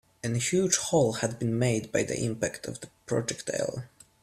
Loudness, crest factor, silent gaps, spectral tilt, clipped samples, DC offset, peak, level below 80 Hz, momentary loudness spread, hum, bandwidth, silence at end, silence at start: -28 LUFS; 18 dB; none; -4.5 dB/octave; under 0.1%; under 0.1%; -10 dBFS; -60 dBFS; 14 LU; none; 15 kHz; 0.35 s; 0.25 s